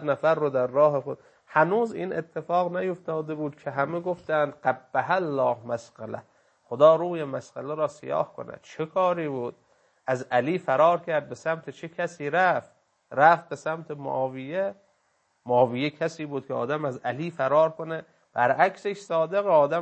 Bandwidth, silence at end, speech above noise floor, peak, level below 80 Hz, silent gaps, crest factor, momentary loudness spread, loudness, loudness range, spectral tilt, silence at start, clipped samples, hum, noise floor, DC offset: 8.6 kHz; 0 s; 45 dB; -4 dBFS; -74 dBFS; none; 22 dB; 13 LU; -26 LUFS; 3 LU; -6.5 dB/octave; 0 s; under 0.1%; none; -70 dBFS; under 0.1%